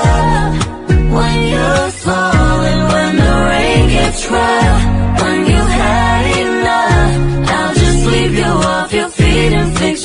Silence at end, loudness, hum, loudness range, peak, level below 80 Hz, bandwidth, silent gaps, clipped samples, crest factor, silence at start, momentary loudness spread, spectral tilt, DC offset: 0 s; -12 LUFS; none; 1 LU; -2 dBFS; -18 dBFS; 11 kHz; none; under 0.1%; 10 dB; 0 s; 3 LU; -5.5 dB/octave; under 0.1%